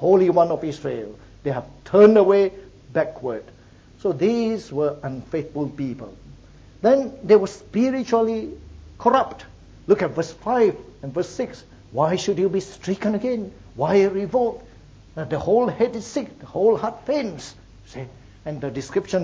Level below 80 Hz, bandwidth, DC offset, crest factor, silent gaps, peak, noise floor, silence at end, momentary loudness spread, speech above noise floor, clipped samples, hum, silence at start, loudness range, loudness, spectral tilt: -50 dBFS; 8 kHz; under 0.1%; 18 dB; none; -2 dBFS; -46 dBFS; 0 s; 18 LU; 26 dB; under 0.1%; none; 0 s; 6 LU; -22 LUFS; -6.5 dB/octave